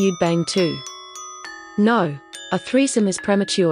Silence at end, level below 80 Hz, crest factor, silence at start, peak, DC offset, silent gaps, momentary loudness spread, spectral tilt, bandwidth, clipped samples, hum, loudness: 0 s; -60 dBFS; 14 dB; 0 s; -6 dBFS; under 0.1%; none; 16 LU; -5 dB/octave; 10.5 kHz; under 0.1%; none; -20 LUFS